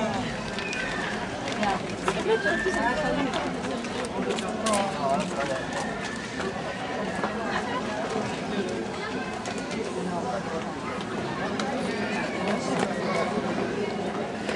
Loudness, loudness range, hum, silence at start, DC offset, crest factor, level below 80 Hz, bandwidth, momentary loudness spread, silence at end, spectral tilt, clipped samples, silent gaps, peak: -29 LUFS; 4 LU; none; 0 s; under 0.1%; 20 dB; -52 dBFS; 11.5 kHz; 6 LU; 0 s; -4.5 dB/octave; under 0.1%; none; -8 dBFS